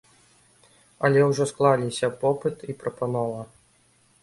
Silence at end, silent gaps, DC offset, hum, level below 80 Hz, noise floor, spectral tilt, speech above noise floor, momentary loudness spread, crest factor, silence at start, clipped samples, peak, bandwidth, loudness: 0.8 s; none; under 0.1%; none; -64 dBFS; -62 dBFS; -6 dB/octave; 38 dB; 13 LU; 20 dB; 1 s; under 0.1%; -6 dBFS; 11.5 kHz; -24 LUFS